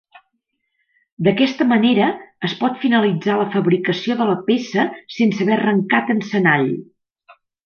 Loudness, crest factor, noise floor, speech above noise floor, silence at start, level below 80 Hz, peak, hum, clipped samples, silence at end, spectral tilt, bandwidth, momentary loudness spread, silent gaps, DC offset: -18 LUFS; 16 dB; -73 dBFS; 55 dB; 1.2 s; -66 dBFS; -2 dBFS; none; under 0.1%; 0.85 s; -6.5 dB/octave; 6.8 kHz; 5 LU; none; under 0.1%